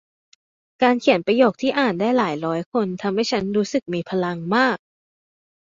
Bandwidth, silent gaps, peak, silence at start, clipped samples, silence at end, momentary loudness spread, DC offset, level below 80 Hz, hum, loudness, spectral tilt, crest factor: 7.6 kHz; 2.66-2.72 s; -2 dBFS; 0.8 s; under 0.1%; 1.05 s; 7 LU; under 0.1%; -62 dBFS; none; -21 LUFS; -5.5 dB/octave; 20 dB